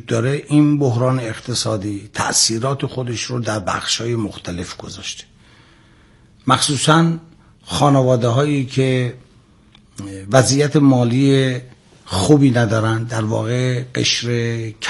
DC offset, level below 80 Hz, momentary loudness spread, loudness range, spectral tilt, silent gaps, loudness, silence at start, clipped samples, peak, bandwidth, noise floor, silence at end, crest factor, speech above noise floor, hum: under 0.1%; -52 dBFS; 14 LU; 6 LU; -5 dB/octave; none; -17 LUFS; 0.05 s; under 0.1%; 0 dBFS; 11.5 kHz; -50 dBFS; 0 s; 18 dB; 33 dB; none